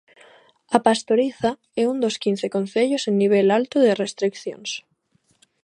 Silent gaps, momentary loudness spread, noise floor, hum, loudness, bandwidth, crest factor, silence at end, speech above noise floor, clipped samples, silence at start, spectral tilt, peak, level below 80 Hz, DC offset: none; 10 LU; -65 dBFS; none; -21 LUFS; 11 kHz; 22 dB; 0.85 s; 45 dB; under 0.1%; 0.7 s; -5 dB/octave; 0 dBFS; -66 dBFS; under 0.1%